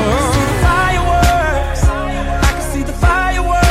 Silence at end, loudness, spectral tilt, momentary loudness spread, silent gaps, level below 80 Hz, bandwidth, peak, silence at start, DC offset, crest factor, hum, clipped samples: 0 s; -15 LUFS; -5 dB/octave; 6 LU; none; -18 dBFS; 16 kHz; 0 dBFS; 0 s; under 0.1%; 12 dB; none; under 0.1%